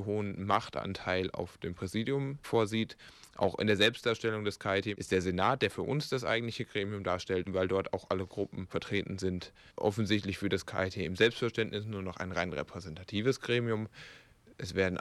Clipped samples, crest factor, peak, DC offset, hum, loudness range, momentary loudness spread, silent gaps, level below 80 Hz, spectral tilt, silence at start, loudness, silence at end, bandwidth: under 0.1%; 22 dB; -12 dBFS; under 0.1%; none; 4 LU; 11 LU; none; -62 dBFS; -5.5 dB/octave; 0 s; -33 LUFS; 0 s; 14 kHz